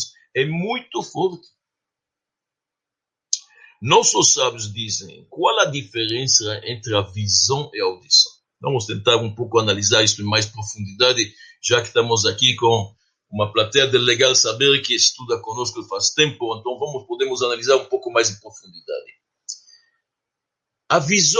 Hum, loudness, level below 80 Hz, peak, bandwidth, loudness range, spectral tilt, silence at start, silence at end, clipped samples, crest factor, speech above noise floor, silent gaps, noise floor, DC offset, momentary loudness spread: none; -18 LUFS; -62 dBFS; 0 dBFS; 11 kHz; 7 LU; -2 dB/octave; 0 s; 0 s; under 0.1%; 20 dB; 67 dB; none; -86 dBFS; under 0.1%; 13 LU